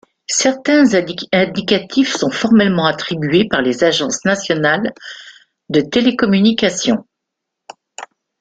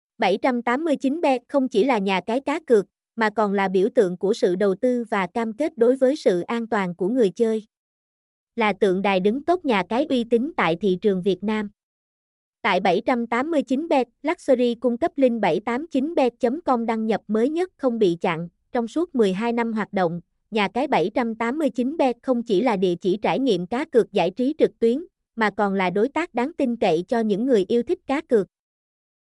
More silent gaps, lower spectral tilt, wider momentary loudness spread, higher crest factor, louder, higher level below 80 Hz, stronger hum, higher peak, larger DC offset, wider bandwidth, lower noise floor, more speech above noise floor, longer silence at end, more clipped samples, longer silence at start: second, none vs 7.77-8.47 s, 11.83-12.53 s; second, -4 dB/octave vs -6.5 dB/octave; first, 11 LU vs 5 LU; about the same, 14 dB vs 16 dB; first, -15 LUFS vs -22 LUFS; first, -54 dBFS vs -62 dBFS; neither; first, 0 dBFS vs -6 dBFS; neither; second, 9.4 kHz vs 11.5 kHz; second, -78 dBFS vs under -90 dBFS; second, 64 dB vs over 69 dB; second, 0.35 s vs 0.85 s; neither; about the same, 0.3 s vs 0.2 s